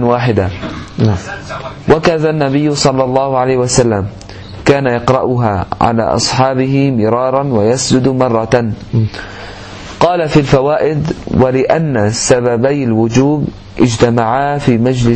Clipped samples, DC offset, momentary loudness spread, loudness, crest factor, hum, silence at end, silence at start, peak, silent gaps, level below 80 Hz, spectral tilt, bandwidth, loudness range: 0.2%; under 0.1%; 11 LU; -12 LUFS; 12 dB; none; 0 s; 0 s; 0 dBFS; none; -36 dBFS; -5.5 dB/octave; 8.8 kHz; 2 LU